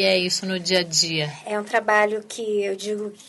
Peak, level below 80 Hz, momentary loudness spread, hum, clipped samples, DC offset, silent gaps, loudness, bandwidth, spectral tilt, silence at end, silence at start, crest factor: -6 dBFS; -72 dBFS; 9 LU; none; under 0.1%; under 0.1%; none; -22 LUFS; 11.5 kHz; -2.5 dB/octave; 0.05 s; 0 s; 16 dB